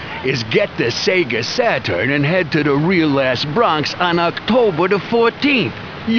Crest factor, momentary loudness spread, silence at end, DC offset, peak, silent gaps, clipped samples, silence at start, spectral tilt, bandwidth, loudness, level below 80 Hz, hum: 14 dB; 3 LU; 0 s; 0.2%; -2 dBFS; none; under 0.1%; 0 s; -5.5 dB/octave; 5.4 kHz; -16 LUFS; -48 dBFS; none